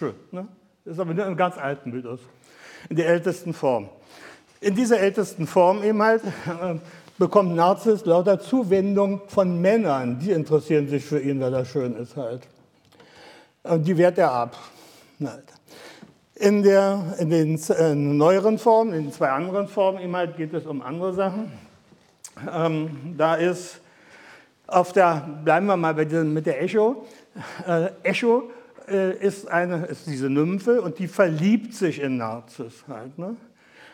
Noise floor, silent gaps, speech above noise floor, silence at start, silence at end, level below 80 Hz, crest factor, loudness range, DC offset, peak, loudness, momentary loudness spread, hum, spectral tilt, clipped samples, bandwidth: -56 dBFS; none; 34 dB; 0 s; 0.6 s; -72 dBFS; 20 dB; 6 LU; under 0.1%; -4 dBFS; -22 LUFS; 16 LU; none; -6.5 dB/octave; under 0.1%; 16.5 kHz